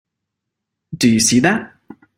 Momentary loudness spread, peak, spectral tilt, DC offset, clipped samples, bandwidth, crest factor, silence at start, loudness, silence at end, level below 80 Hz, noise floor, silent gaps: 12 LU; -2 dBFS; -3.5 dB/octave; under 0.1%; under 0.1%; 16.5 kHz; 18 dB; 0.9 s; -15 LUFS; 0.5 s; -52 dBFS; -79 dBFS; none